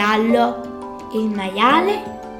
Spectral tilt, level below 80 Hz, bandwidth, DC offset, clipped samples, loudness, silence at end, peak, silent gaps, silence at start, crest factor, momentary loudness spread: -5 dB/octave; -52 dBFS; 16.5 kHz; under 0.1%; under 0.1%; -18 LUFS; 0 s; -2 dBFS; none; 0 s; 16 dB; 15 LU